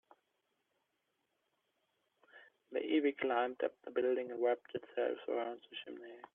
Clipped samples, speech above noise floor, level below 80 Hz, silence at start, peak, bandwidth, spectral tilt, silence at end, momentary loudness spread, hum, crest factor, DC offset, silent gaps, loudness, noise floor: under 0.1%; 47 dB; -90 dBFS; 2.35 s; -22 dBFS; 3.9 kHz; -7 dB/octave; 0.15 s; 13 LU; none; 18 dB; under 0.1%; none; -38 LUFS; -84 dBFS